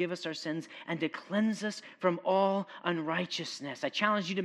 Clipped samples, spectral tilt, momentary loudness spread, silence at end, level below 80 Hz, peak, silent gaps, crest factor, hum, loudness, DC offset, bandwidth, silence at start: under 0.1%; -5 dB/octave; 9 LU; 0 s; -88 dBFS; -12 dBFS; none; 20 dB; none; -33 LUFS; under 0.1%; 12 kHz; 0 s